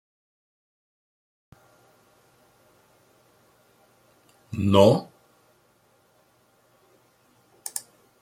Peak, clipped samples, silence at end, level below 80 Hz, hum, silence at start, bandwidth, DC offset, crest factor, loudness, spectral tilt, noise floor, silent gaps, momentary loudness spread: -4 dBFS; under 0.1%; 0.4 s; -68 dBFS; none; 4.5 s; 16.5 kHz; under 0.1%; 26 dB; -22 LUFS; -6 dB/octave; -63 dBFS; none; 21 LU